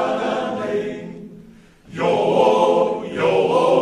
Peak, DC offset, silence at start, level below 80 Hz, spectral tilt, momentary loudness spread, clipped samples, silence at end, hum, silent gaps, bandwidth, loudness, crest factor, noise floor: -4 dBFS; under 0.1%; 0 s; -56 dBFS; -6 dB/octave; 17 LU; under 0.1%; 0 s; none; none; 11 kHz; -19 LUFS; 16 dB; -45 dBFS